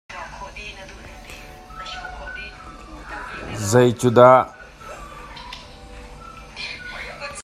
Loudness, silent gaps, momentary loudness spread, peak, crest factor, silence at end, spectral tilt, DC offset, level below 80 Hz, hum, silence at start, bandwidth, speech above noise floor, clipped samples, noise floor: -18 LUFS; none; 25 LU; 0 dBFS; 22 dB; 0 s; -5.5 dB/octave; under 0.1%; -44 dBFS; none; 0.1 s; 14.5 kHz; 25 dB; under 0.1%; -40 dBFS